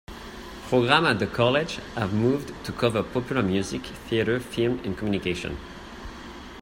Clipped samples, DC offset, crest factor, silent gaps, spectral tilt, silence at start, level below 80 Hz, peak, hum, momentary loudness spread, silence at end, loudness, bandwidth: under 0.1%; under 0.1%; 22 dB; none; -5.5 dB/octave; 0.1 s; -48 dBFS; -4 dBFS; none; 19 LU; 0 s; -25 LUFS; 16 kHz